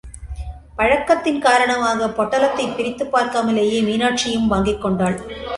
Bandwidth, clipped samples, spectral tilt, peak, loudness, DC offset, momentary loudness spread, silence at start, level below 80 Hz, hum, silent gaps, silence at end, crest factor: 11.5 kHz; under 0.1%; -4.5 dB/octave; -2 dBFS; -18 LUFS; under 0.1%; 11 LU; 0.05 s; -38 dBFS; none; none; 0 s; 16 dB